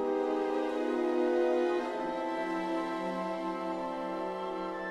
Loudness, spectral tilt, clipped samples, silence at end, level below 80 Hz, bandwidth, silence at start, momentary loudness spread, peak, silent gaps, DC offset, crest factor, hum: -33 LUFS; -6 dB/octave; under 0.1%; 0 s; -66 dBFS; 11.5 kHz; 0 s; 7 LU; -18 dBFS; none; under 0.1%; 14 dB; none